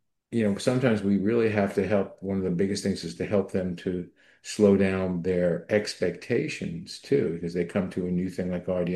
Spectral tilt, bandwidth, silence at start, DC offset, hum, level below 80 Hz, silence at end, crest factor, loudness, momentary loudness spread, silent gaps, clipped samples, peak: -6.5 dB/octave; 12.5 kHz; 0.3 s; under 0.1%; none; -60 dBFS; 0 s; 18 dB; -27 LUFS; 9 LU; none; under 0.1%; -8 dBFS